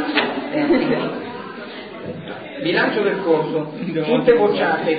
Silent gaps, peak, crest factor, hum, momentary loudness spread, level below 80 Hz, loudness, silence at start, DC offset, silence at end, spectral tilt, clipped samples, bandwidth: none; -2 dBFS; 18 dB; none; 16 LU; -58 dBFS; -19 LUFS; 0 s; 0.1%; 0 s; -10.5 dB/octave; under 0.1%; 5 kHz